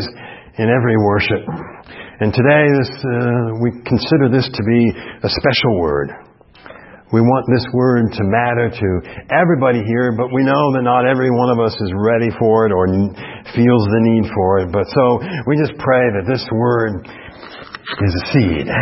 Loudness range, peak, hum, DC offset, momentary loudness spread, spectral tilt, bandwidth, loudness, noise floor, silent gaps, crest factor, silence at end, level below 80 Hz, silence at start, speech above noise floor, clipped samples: 2 LU; 0 dBFS; none; under 0.1%; 11 LU; -11 dB/octave; 5.8 kHz; -15 LUFS; -40 dBFS; none; 16 dB; 0 s; -42 dBFS; 0 s; 25 dB; under 0.1%